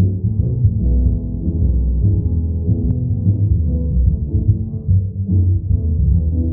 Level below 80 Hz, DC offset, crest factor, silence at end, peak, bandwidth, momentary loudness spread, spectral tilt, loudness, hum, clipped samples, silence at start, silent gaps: -20 dBFS; under 0.1%; 12 dB; 0 s; -2 dBFS; 1 kHz; 3 LU; -19.5 dB/octave; -18 LUFS; none; under 0.1%; 0 s; none